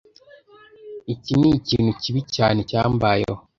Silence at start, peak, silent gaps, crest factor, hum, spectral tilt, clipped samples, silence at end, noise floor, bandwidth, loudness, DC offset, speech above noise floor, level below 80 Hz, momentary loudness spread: 0.85 s; -2 dBFS; none; 20 dB; none; -6.5 dB/octave; under 0.1%; 0.2 s; -50 dBFS; 7.4 kHz; -20 LUFS; under 0.1%; 30 dB; -46 dBFS; 13 LU